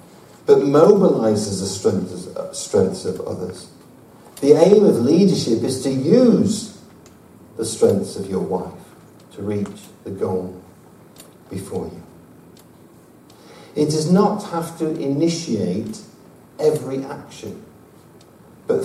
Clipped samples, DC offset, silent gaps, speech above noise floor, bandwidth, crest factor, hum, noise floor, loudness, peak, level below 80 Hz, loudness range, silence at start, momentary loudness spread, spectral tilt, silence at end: under 0.1%; under 0.1%; none; 29 dB; 15 kHz; 20 dB; none; -47 dBFS; -18 LUFS; 0 dBFS; -58 dBFS; 13 LU; 0.45 s; 21 LU; -6.5 dB/octave; 0 s